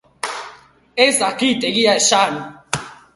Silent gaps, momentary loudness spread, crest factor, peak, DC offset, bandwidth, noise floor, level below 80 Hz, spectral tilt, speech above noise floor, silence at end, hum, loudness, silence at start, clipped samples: none; 15 LU; 18 dB; 0 dBFS; under 0.1%; 11.5 kHz; -44 dBFS; -58 dBFS; -2 dB/octave; 28 dB; 0.2 s; none; -16 LUFS; 0.25 s; under 0.1%